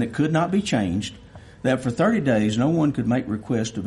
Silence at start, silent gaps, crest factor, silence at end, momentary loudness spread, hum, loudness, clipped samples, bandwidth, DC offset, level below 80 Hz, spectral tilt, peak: 0 s; none; 14 dB; 0 s; 6 LU; none; -22 LUFS; under 0.1%; 11.5 kHz; under 0.1%; -52 dBFS; -6.5 dB/octave; -8 dBFS